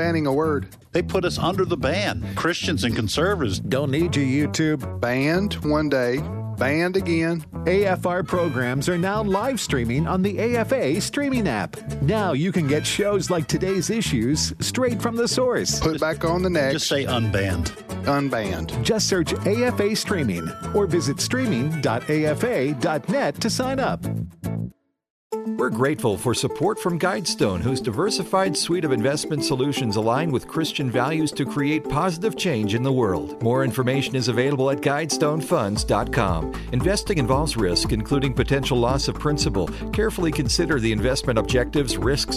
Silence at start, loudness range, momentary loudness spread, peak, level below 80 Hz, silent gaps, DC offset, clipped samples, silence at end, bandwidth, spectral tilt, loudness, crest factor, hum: 0 s; 1 LU; 4 LU; -8 dBFS; -40 dBFS; 25.10-25.30 s; under 0.1%; under 0.1%; 0 s; 14 kHz; -5 dB/octave; -22 LUFS; 14 dB; none